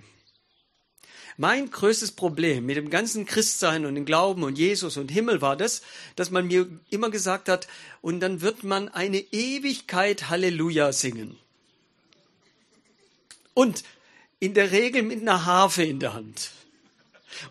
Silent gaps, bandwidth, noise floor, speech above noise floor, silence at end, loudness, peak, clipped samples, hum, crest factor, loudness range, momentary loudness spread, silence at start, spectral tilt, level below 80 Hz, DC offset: none; 13.5 kHz; -69 dBFS; 44 dB; 0 s; -24 LUFS; -2 dBFS; under 0.1%; none; 24 dB; 5 LU; 11 LU; 1.15 s; -3.5 dB/octave; -72 dBFS; under 0.1%